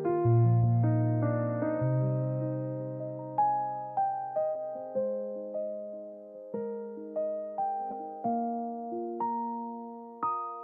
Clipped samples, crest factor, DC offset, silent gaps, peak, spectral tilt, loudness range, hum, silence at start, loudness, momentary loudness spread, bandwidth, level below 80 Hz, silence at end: under 0.1%; 14 dB; under 0.1%; none; -16 dBFS; -12.5 dB/octave; 7 LU; none; 0 s; -31 LUFS; 12 LU; 2.6 kHz; -64 dBFS; 0 s